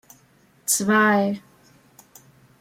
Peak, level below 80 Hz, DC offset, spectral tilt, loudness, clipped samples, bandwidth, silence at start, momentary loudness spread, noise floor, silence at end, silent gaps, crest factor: -6 dBFS; -70 dBFS; under 0.1%; -3.5 dB/octave; -20 LUFS; under 0.1%; 16.5 kHz; 0.65 s; 15 LU; -58 dBFS; 1.2 s; none; 18 dB